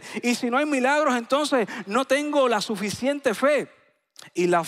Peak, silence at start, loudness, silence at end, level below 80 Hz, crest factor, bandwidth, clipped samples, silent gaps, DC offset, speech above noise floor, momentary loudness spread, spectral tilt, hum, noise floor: -8 dBFS; 0 s; -23 LUFS; 0 s; -70 dBFS; 16 dB; 15.5 kHz; under 0.1%; none; under 0.1%; 28 dB; 5 LU; -4 dB/octave; none; -51 dBFS